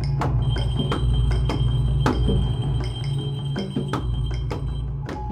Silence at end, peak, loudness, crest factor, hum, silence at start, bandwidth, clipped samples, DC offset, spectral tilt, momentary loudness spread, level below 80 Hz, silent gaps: 0 s; -6 dBFS; -24 LUFS; 18 dB; none; 0 s; 9.8 kHz; under 0.1%; under 0.1%; -7.5 dB/octave; 7 LU; -26 dBFS; none